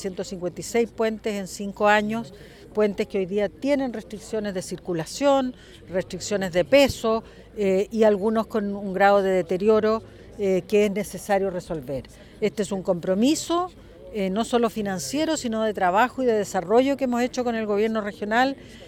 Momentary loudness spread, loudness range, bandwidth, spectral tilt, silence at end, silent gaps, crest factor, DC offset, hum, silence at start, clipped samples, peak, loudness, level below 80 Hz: 11 LU; 4 LU; 17 kHz; -5 dB/octave; 0 s; none; 18 dB; under 0.1%; none; 0 s; under 0.1%; -4 dBFS; -24 LUFS; -52 dBFS